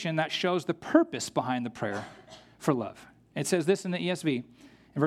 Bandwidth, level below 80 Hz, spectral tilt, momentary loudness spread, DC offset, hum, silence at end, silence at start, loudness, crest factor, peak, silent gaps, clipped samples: 15.5 kHz; -70 dBFS; -5 dB/octave; 13 LU; under 0.1%; none; 0 s; 0 s; -30 LUFS; 22 dB; -6 dBFS; none; under 0.1%